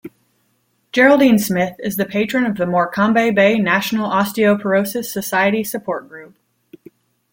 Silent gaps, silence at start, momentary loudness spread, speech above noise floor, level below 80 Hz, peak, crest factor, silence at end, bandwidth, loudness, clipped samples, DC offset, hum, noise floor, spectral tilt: none; 0.05 s; 10 LU; 48 dB; -58 dBFS; -2 dBFS; 16 dB; 1.05 s; 17 kHz; -16 LUFS; under 0.1%; under 0.1%; none; -64 dBFS; -5 dB/octave